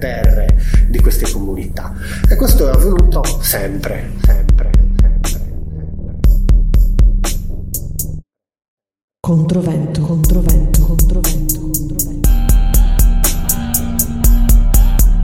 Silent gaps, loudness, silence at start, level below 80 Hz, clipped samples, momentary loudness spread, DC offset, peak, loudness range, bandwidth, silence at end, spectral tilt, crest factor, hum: 8.68-8.77 s, 9.04-9.08 s; -15 LUFS; 0 s; -12 dBFS; under 0.1%; 11 LU; 0.9%; 0 dBFS; 4 LU; 17 kHz; 0 s; -5.5 dB/octave; 12 dB; none